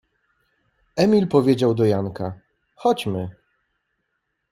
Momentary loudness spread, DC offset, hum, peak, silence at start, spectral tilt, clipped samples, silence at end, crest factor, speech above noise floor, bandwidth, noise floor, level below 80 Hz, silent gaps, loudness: 14 LU; under 0.1%; none; -2 dBFS; 0.95 s; -7.5 dB/octave; under 0.1%; 1.2 s; 20 dB; 56 dB; 14.5 kHz; -75 dBFS; -58 dBFS; none; -21 LUFS